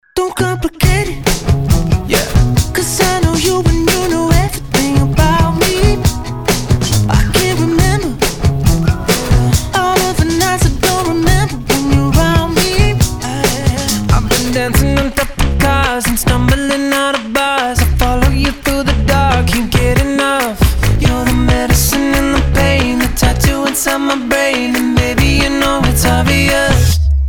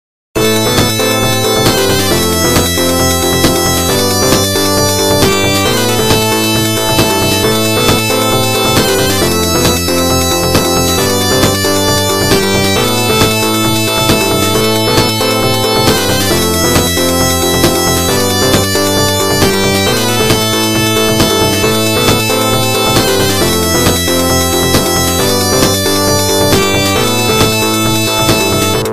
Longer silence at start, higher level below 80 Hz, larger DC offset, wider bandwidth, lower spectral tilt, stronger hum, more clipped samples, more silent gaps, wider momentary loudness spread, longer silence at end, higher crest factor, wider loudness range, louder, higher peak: second, 0.15 s vs 0.35 s; first, -18 dBFS vs -30 dBFS; second, under 0.1% vs 3%; first, over 20 kHz vs 16 kHz; about the same, -4.5 dB/octave vs -3.5 dB/octave; neither; neither; neither; about the same, 3 LU vs 1 LU; about the same, 0 s vs 0 s; about the same, 12 dB vs 10 dB; about the same, 1 LU vs 0 LU; second, -13 LUFS vs -10 LUFS; about the same, 0 dBFS vs 0 dBFS